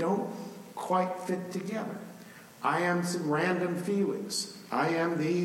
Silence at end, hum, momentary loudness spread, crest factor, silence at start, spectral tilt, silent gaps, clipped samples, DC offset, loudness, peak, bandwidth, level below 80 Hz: 0 s; none; 14 LU; 16 dB; 0 s; -5 dB/octave; none; under 0.1%; under 0.1%; -31 LUFS; -14 dBFS; 16.5 kHz; -78 dBFS